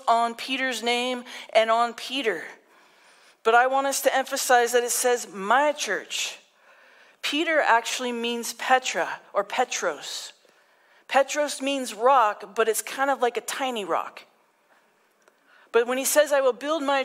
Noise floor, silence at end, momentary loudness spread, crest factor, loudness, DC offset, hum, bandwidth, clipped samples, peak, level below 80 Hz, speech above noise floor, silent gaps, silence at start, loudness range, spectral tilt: -63 dBFS; 0 s; 9 LU; 18 dB; -24 LUFS; under 0.1%; none; 16 kHz; under 0.1%; -8 dBFS; -86 dBFS; 39 dB; none; 0 s; 5 LU; -1 dB/octave